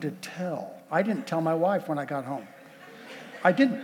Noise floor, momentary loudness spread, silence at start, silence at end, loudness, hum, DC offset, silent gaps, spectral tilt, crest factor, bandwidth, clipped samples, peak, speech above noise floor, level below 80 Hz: -48 dBFS; 21 LU; 0 s; 0 s; -28 LUFS; none; under 0.1%; none; -6.5 dB/octave; 20 dB; 17.5 kHz; under 0.1%; -8 dBFS; 21 dB; -88 dBFS